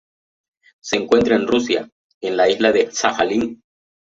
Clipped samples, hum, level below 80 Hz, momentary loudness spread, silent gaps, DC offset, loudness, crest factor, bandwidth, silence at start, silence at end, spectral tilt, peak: under 0.1%; none; -54 dBFS; 12 LU; 1.92-2.21 s; under 0.1%; -18 LUFS; 18 dB; 7.8 kHz; 0.85 s; 0.6 s; -3.5 dB/octave; -2 dBFS